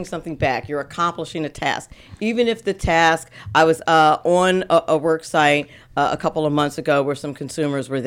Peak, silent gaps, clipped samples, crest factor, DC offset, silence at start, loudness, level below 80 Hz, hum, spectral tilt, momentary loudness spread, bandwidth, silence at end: -4 dBFS; none; under 0.1%; 16 dB; under 0.1%; 0 s; -19 LUFS; -44 dBFS; none; -5 dB/octave; 11 LU; 16 kHz; 0 s